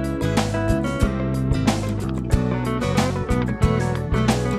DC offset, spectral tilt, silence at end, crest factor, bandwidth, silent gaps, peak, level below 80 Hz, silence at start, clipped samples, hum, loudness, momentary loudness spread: under 0.1%; -6.5 dB/octave; 0 s; 16 dB; 15 kHz; none; -4 dBFS; -30 dBFS; 0 s; under 0.1%; none; -22 LUFS; 2 LU